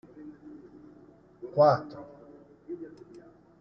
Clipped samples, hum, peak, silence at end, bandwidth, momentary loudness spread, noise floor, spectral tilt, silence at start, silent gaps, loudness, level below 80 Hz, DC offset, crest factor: under 0.1%; none; -10 dBFS; 0.75 s; 6.4 kHz; 28 LU; -56 dBFS; -6 dB/octave; 0.15 s; none; -25 LUFS; -70 dBFS; under 0.1%; 22 dB